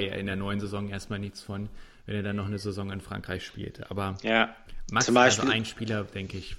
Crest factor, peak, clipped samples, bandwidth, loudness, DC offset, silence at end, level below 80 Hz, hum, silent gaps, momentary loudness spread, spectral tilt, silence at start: 22 dB; -6 dBFS; under 0.1%; 14 kHz; -29 LUFS; under 0.1%; 0 s; -50 dBFS; none; none; 17 LU; -4 dB/octave; 0 s